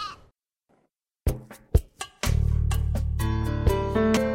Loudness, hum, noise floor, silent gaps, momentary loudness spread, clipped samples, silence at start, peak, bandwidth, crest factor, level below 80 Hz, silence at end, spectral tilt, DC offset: -27 LUFS; none; -72 dBFS; none; 9 LU; under 0.1%; 0 s; -6 dBFS; 16.5 kHz; 18 dB; -30 dBFS; 0 s; -6.5 dB/octave; under 0.1%